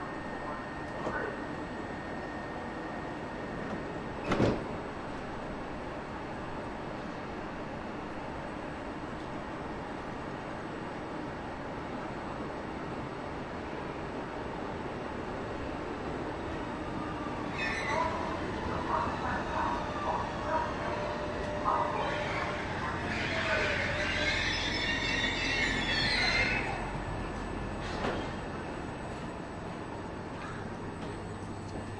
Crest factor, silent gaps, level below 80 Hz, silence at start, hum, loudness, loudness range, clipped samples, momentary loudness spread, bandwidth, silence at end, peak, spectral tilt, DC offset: 20 dB; none; -48 dBFS; 0 s; none; -35 LUFS; 10 LU; under 0.1%; 11 LU; 11.5 kHz; 0 s; -14 dBFS; -5 dB/octave; under 0.1%